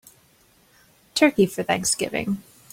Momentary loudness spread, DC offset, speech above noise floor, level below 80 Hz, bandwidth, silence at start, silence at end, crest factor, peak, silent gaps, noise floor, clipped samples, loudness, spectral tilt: 11 LU; under 0.1%; 37 dB; -58 dBFS; 16.5 kHz; 1.15 s; 0.3 s; 22 dB; -2 dBFS; none; -58 dBFS; under 0.1%; -22 LUFS; -3.5 dB/octave